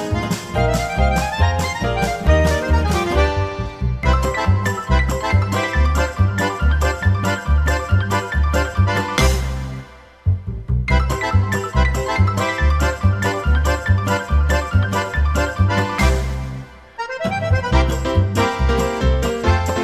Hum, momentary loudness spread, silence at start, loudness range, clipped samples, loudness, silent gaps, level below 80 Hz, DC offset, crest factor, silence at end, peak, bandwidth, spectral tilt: none; 5 LU; 0 s; 2 LU; under 0.1%; -19 LUFS; none; -22 dBFS; under 0.1%; 16 dB; 0 s; -2 dBFS; 14.5 kHz; -5.5 dB/octave